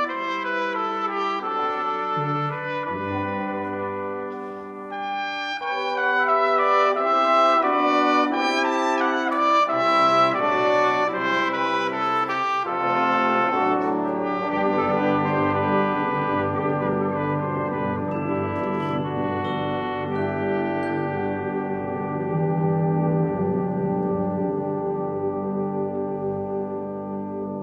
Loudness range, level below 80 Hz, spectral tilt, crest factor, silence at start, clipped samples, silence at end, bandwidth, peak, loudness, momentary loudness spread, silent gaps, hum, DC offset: 7 LU; -62 dBFS; -6.5 dB/octave; 16 dB; 0 s; under 0.1%; 0 s; 9.2 kHz; -6 dBFS; -23 LUFS; 9 LU; none; none; under 0.1%